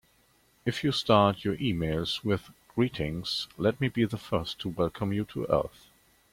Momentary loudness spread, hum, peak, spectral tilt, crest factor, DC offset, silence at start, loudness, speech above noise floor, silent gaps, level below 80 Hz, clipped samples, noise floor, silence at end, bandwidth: 9 LU; none; -8 dBFS; -6 dB/octave; 22 dB; under 0.1%; 0.65 s; -29 LUFS; 37 dB; none; -54 dBFS; under 0.1%; -65 dBFS; 0.65 s; 16.5 kHz